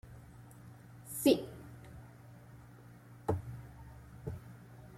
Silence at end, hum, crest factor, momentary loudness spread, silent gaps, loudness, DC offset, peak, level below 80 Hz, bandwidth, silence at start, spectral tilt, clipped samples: 0 s; none; 26 dB; 25 LU; none; -36 LUFS; under 0.1%; -14 dBFS; -60 dBFS; 16.5 kHz; 0.05 s; -5.5 dB/octave; under 0.1%